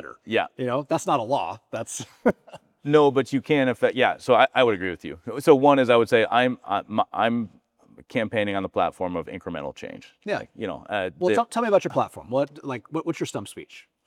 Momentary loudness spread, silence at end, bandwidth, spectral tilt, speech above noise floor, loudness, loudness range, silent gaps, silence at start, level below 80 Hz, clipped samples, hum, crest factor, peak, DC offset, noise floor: 15 LU; 0.25 s; 14.5 kHz; -5 dB/octave; 31 dB; -23 LUFS; 8 LU; none; 0 s; -64 dBFS; under 0.1%; none; 22 dB; -2 dBFS; under 0.1%; -54 dBFS